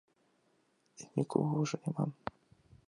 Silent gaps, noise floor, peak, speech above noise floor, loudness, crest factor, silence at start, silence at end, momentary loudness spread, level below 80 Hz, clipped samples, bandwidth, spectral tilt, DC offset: none; -74 dBFS; -16 dBFS; 40 dB; -36 LUFS; 22 dB; 1 s; 0.75 s; 14 LU; -72 dBFS; under 0.1%; 11 kHz; -7 dB/octave; under 0.1%